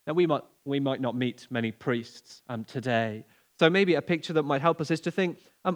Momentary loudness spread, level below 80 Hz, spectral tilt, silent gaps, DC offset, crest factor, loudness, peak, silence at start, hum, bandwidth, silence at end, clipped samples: 12 LU; -80 dBFS; -6.5 dB/octave; none; under 0.1%; 22 dB; -28 LUFS; -6 dBFS; 0.05 s; none; 15 kHz; 0 s; under 0.1%